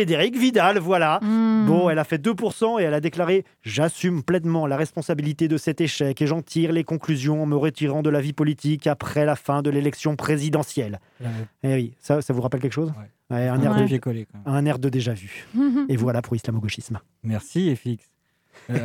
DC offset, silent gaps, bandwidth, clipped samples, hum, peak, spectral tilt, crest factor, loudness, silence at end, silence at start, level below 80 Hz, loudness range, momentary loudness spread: under 0.1%; none; 16.5 kHz; under 0.1%; none; -4 dBFS; -6.5 dB/octave; 18 dB; -23 LUFS; 0 s; 0 s; -62 dBFS; 4 LU; 10 LU